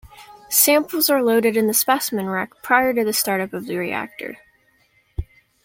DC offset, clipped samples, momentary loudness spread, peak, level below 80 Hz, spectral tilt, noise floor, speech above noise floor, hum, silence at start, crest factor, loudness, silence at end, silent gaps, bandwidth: under 0.1%; under 0.1%; 18 LU; 0 dBFS; -46 dBFS; -2.5 dB/octave; -60 dBFS; 41 dB; none; 0.05 s; 20 dB; -19 LUFS; 0.4 s; none; 16.5 kHz